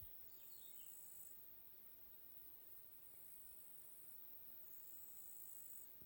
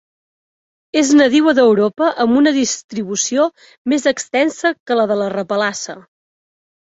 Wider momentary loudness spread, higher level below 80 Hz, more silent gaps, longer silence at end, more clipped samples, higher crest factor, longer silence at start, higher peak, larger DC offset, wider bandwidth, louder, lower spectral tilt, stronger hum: second, 4 LU vs 9 LU; second, -82 dBFS vs -60 dBFS; second, none vs 2.84-2.89 s, 3.78-3.85 s, 4.80-4.86 s; second, 0 s vs 0.85 s; neither; about the same, 16 dB vs 14 dB; second, 0 s vs 0.95 s; second, -42 dBFS vs -2 dBFS; neither; first, 17 kHz vs 8 kHz; second, -55 LUFS vs -15 LUFS; second, -1.5 dB/octave vs -3.5 dB/octave; neither